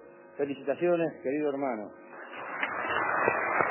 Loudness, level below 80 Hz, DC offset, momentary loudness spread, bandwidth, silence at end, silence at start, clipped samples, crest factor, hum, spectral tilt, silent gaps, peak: -30 LUFS; -70 dBFS; under 0.1%; 16 LU; 3.2 kHz; 0 s; 0 s; under 0.1%; 22 dB; none; -3.5 dB/octave; none; -8 dBFS